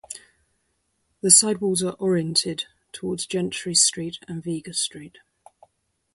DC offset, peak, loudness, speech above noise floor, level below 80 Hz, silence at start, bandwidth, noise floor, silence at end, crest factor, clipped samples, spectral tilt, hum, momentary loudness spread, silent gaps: under 0.1%; 0 dBFS; -21 LUFS; 49 dB; -64 dBFS; 0.1 s; 12 kHz; -72 dBFS; 1.05 s; 26 dB; under 0.1%; -2.5 dB/octave; none; 19 LU; none